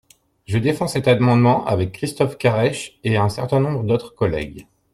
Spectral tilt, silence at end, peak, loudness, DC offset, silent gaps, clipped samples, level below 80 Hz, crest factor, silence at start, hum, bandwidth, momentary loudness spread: -6.5 dB/octave; 0.3 s; -2 dBFS; -19 LUFS; under 0.1%; none; under 0.1%; -48 dBFS; 16 dB; 0.5 s; none; 13.5 kHz; 9 LU